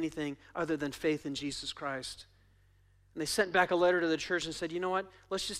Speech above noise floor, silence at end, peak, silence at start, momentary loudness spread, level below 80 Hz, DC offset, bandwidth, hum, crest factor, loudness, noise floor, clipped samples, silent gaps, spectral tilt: 32 dB; 0 s; -14 dBFS; 0 s; 12 LU; -64 dBFS; under 0.1%; 15.5 kHz; none; 20 dB; -33 LUFS; -65 dBFS; under 0.1%; none; -3.5 dB/octave